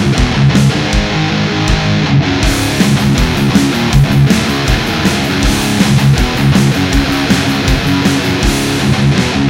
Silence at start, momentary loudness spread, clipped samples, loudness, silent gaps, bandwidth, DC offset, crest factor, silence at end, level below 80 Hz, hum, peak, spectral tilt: 0 s; 3 LU; 0.1%; -11 LUFS; none; 16.5 kHz; under 0.1%; 10 dB; 0 s; -20 dBFS; none; 0 dBFS; -5 dB/octave